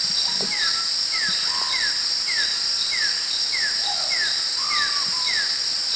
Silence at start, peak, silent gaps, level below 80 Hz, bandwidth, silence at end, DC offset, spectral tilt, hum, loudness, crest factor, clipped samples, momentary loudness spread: 0 s; -8 dBFS; none; -60 dBFS; 8 kHz; 0 s; under 0.1%; 1.5 dB/octave; none; -20 LUFS; 14 dB; under 0.1%; 1 LU